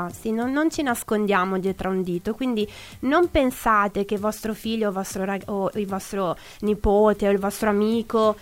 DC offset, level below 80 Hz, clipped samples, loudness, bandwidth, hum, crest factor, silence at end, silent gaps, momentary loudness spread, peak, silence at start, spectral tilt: under 0.1%; -42 dBFS; under 0.1%; -23 LUFS; 16.5 kHz; none; 16 dB; 0 s; none; 8 LU; -6 dBFS; 0 s; -5.5 dB/octave